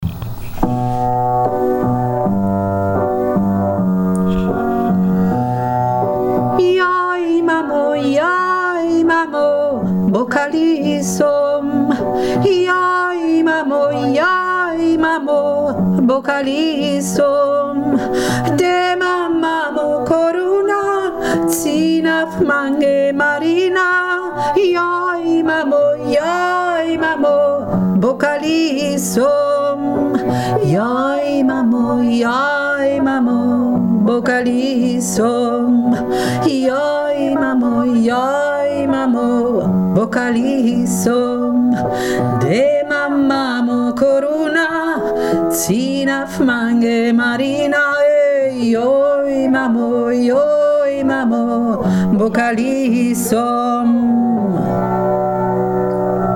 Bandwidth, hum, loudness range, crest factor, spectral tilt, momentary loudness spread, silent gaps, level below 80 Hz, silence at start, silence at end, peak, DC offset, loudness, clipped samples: 17 kHz; none; 1 LU; 14 dB; -6 dB/octave; 3 LU; none; -42 dBFS; 0 s; 0 s; 0 dBFS; under 0.1%; -15 LUFS; under 0.1%